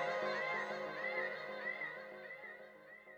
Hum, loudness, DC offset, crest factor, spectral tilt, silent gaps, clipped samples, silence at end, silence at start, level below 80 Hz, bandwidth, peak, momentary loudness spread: none; -41 LUFS; under 0.1%; 16 dB; -4 dB/octave; none; under 0.1%; 0 s; 0 s; -86 dBFS; 19.5 kHz; -28 dBFS; 15 LU